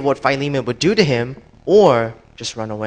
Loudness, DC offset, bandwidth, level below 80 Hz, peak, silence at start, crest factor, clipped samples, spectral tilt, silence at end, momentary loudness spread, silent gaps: -16 LUFS; under 0.1%; 9.4 kHz; -50 dBFS; 0 dBFS; 0 s; 16 dB; under 0.1%; -5.5 dB/octave; 0 s; 16 LU; none